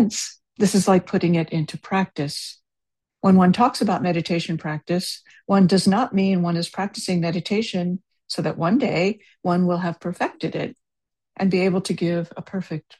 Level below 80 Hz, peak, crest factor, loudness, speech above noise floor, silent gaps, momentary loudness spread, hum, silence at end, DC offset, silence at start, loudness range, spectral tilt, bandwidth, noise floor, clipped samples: -62 dBFS; -4 dBFS; 18 dB; -22 LUFS; 66 dB; none; 13 LU; none; 0.2 s; under 0.1%; 0 s; 4 LU; -6 dB/octave; 12.5 kHz; -87 dBFS; under 0.1%